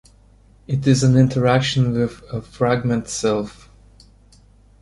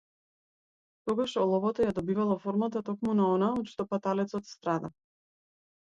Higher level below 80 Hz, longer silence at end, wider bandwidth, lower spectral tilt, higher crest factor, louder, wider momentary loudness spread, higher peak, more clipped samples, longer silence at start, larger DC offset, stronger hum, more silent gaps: first, -46 dBFS vs -66 dBFS; first, 1.3 s vs 1.05 s; first, 11.5 kHz vs 7.8 kHz; second, -6 dB/octave vs -7.5 dB/octave; about the same, 18 dB vs 16 dB; first, -19 LUFS vs -30 LUFS; first, 11 LU vs 7 LU; first, -2 dBFS vs -14 dBFS; neither; second, 0.7 s vs 1.05 s; neither; neither; neither